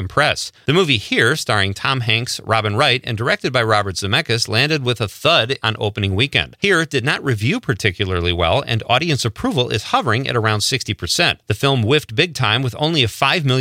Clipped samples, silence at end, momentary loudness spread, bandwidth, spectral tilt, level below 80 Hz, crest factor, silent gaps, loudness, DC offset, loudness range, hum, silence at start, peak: under 0.1%; 0 s; 4 LU; 16 kHz; -4.5 dB/octave; -48 dBFS; 18 dB; none; -17 LUFS; under 0.1%; 1 LU; none; 0 s; 0 dBFS